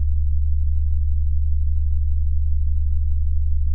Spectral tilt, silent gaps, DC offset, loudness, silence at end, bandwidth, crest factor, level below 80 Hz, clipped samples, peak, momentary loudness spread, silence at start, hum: -13 dB/octave; none; under 0.1%; -23 LUFS; 0 s; 0.2 kHz; 8 dB; -20 dBFS; under 0.1%; -10 dBFS; 1 LU; 0 s; none